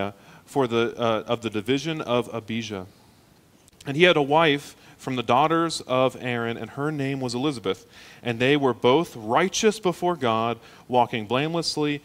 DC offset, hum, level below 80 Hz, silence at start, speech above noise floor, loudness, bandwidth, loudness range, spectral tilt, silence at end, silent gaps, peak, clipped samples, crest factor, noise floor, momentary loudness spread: under 0.1%; none; -60 dBFS; 0 s; 32 dB; -24 LUFS; 16 kHz; 4 LU; -5 dB/octave; 0.05 s; none; 0 dBFS; under 0.1%; 24 dB; -56 dBFS; 11 LU